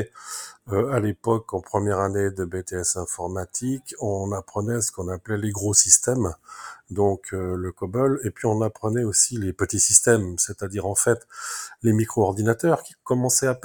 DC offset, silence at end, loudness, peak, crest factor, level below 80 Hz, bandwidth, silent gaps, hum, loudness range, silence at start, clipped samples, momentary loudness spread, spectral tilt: under 0.1%; 0.05 s; -22 LUFS; 0 dBFS; 24 dB; -56 dBFS; over 20 kHz; none; none; 6 LU; 0 s; under 0.1%; 14 LU; -4 dB/octave